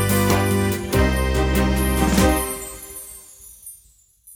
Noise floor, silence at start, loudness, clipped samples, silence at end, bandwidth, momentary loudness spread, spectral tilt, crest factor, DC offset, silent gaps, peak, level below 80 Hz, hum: -55 dBFS; 0 s; -19 LUFS; under 0.1%; 0 s; over 20 kHz; 21 LU; -5 dB/octave; 18 dB; under 0.1%; none; -4 dBFS; -26 dBFS; none